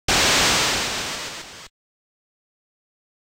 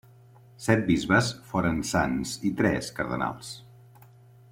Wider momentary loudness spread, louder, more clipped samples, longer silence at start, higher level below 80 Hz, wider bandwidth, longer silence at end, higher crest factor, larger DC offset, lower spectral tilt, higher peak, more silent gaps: first, 19 LU vs 10 LU; first, -19 LUFS vs -26 LUFS; neither; second, 0.1 s vs 0.6 s; first, -44 dBFS vs -50 dBFS; about the same, 16 kHz vs 16.5 kHz; first, 1.6 s vs 0.85 s; second, 14 dB vs 20 dB; neither; second, -1 dB/octave vs -5 dB/octave; about the same, -10 dBFS vs -8 dBFS; neither